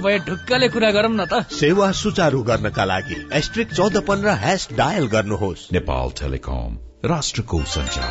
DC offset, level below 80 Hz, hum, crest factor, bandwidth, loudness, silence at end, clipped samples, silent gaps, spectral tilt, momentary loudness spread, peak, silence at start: under 0.1%; -34 dBFS; none; 14 dB; 8 kHz; -20 LUFS; 0 s; under 0.1%; none; -5 dB/octave; 8 LU; -6 dBFS; 0 s